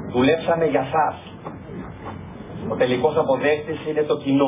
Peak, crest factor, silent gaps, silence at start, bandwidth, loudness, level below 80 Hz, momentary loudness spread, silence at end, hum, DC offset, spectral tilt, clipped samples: -6 dBFS; 16 dB; none; 0 s; 3.8 kHz; -21 LUFS; -48 dBFS; 16 LU; 0 s; none; under 0.1%; -10.5 dB/octave; under 0.1%